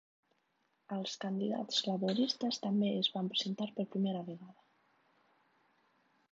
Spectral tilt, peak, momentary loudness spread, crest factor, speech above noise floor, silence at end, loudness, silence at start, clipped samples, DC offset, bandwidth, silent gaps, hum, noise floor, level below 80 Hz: -4.5 dB/octave; -18 dBFS; 9 LU; 20 dB; 43 dB; 1.8 s; -35 LUFS; 0.9 s; under 0.1%; under 0.1%; 7.6 kHz; none; none; -78 dBFS; -88 dBFS